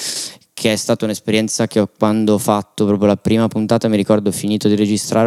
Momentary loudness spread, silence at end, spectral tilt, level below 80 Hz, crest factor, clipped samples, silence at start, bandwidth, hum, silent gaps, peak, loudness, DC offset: 4 LU; 0 s; -5 dB/octave; -56 dBFS; 16 dB; under 0.1%; 0 s; 15 kHz; none; none; 0 dBFS; -16 LUFS; under 0.1%